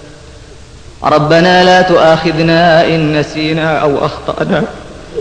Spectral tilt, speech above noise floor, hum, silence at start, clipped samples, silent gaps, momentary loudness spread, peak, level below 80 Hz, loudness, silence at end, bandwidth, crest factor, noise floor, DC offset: -6 dB/octave; 24 dB; none; 0 s; under 0.1%; none; 11 LU; 0 dBFS; -36 dBFS; -10 LUFS; 0 s; 10 kHz; 10 dB; -33 dBFS; under 0.1%